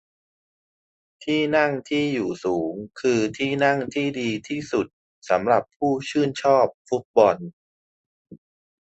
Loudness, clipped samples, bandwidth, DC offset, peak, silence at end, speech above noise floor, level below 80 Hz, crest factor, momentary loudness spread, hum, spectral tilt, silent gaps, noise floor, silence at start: -23 LUFS; under 0.1%; 8.4 kHz; under 0.1%; -2 dBFS; 0.5 s; over 68 dB; -62 dBFS; 22 dB; 9 LU; none; -5.5 dB/octave; 4.93-5.22 s, 5.76-5.80 s, 6.74-6.85 s, 7.05-7.14 s, 7.53-8.25 s; under -90 dBFS; 1.2 s